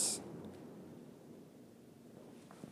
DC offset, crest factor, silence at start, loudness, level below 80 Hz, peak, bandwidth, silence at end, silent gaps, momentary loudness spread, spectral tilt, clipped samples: under 0.1%; 24 dB; 0 s; -47 LUFS; -82 dBFS; -22 dBFS; 15.5 kHz; 0 s; none; 15 LU; -2 dB/octave; under 0.1%